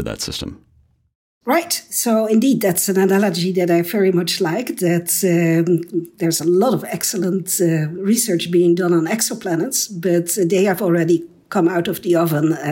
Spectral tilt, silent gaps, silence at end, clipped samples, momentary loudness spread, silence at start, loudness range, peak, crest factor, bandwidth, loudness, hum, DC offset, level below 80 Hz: -4.5 dB/octave; 1.15-1.41 s; 0 s; under 0.1%; 5 LU; 0 s; 1 LU; -6 dBFS; 12 dB; 16.5 kHz; -17 LUFS; none; under 0.1%; -54 dBFS